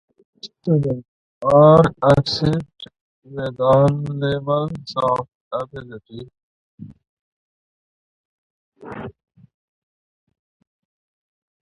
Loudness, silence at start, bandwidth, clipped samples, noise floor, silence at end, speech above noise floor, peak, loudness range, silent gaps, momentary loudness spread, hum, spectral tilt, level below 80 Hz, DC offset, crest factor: -18 LUFS; 0.45 s; 10.5 kHz; under 0.1%; under -90 dBFS; 2.5 s; over 72 dB; 0 dBFS; 19 LU; 1.08-1.41 s, 3.01-3.22 s, 5.35-5.51 s, 6.43-6.78 s, 7.09-8.72 s; 24 LU; none; -8 dB/octave; -48 dBFS; under 0.1%; 20 dB